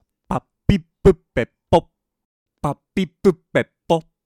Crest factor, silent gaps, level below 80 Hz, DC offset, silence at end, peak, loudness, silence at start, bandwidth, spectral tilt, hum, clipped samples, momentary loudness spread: 18 dB; 2.25-2.46 s; -36 dBFS; under 0.1%; 0.25 s; -2 dBFS; -21 LUFS; 0.3 s; 12 kHz; -7.5 dB/octave; none; under 0.1%; 10 LU